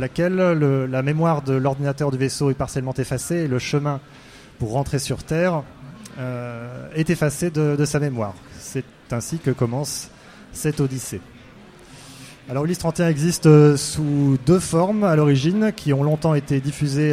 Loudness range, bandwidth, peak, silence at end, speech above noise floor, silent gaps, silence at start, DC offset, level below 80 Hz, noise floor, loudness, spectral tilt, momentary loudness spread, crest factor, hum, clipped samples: 9 LU; 15 kHz; 0 dBFS; 0 s; 25 dB; none; 0 s; under 0.1%; -48 dBFS; -45 dBFS; -21 LUFS; -6.5 dB/octave; 14 LU; 20 dB; none; under 0.1%